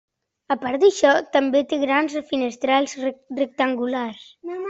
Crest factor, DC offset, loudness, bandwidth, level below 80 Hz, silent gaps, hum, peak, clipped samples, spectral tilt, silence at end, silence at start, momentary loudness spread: 18 dB; under 0.1%; -21 LUFS; 8 kHz; -66 dBFS; none; none; -4 dBFS; under 0.1%; -3 dB/octave; 0 s; 0.5 s; 11 LU